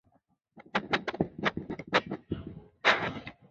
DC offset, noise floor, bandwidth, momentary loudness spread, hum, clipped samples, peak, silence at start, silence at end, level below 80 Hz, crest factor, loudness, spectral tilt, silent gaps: under 0.1%; -71 dBFS; 7.6 kHz; 14 LU; none; under 0.1%; -10 dBFS; 0.55 s; 0.2 s; -58 dBFS; 24 dB; -31 LUFS; -2 dB/octave; none